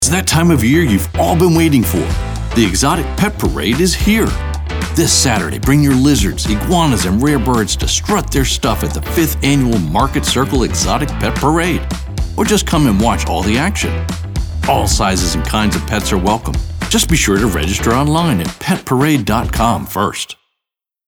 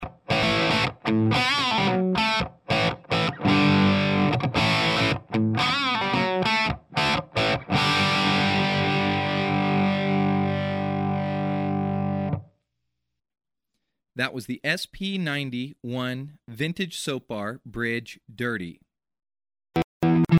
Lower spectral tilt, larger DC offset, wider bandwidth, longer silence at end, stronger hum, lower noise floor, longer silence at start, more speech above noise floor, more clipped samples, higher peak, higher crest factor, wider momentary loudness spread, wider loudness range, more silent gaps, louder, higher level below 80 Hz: about the same, -4.5 dB/octave vs -5.5 dB/octave; neither; first, over 20 kHz vs 14 kHz; first, 0.75 s vs 0 s; neither; about the same, -82 dBFS vs -82 dBFS; about the same, 0 s vs 0 s; first, 69 dB vs 52 dB; neither; first, 0 dBFS vs -8 dBFS; second, 12 dB vs 18 dB; second, 7 LU vs 10 LU; second, 2 LU vs 9 LU; second, none vs 19.84-20.00 s; first, -14 LUFS vs -24 LUFS; first, -24 dBFS vs -52 dBFS